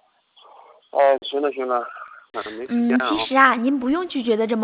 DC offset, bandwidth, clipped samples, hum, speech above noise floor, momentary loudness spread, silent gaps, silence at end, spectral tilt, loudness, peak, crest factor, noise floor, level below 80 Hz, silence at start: under 0.1%; 4 kHz; under 0.1%; none; 34 dB; 16 LU; none; 0 s; -8 dB/octave; -20 LUFS; -2 dBFS; 20 dB; -54 dBFS; -62 dBFS; 0.95 s